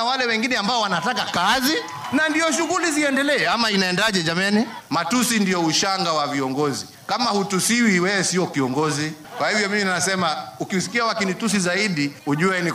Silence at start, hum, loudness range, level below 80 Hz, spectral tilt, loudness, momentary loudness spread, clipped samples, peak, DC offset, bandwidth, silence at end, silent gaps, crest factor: 0 s; none; 2 LU; -60 dBFS; -3.5 dB/octave; -20 LUFS; 6 LU; under 0.1%; -6 dBFS; under 0.1%; 15.5 kHz; 0 s; none; 14 dB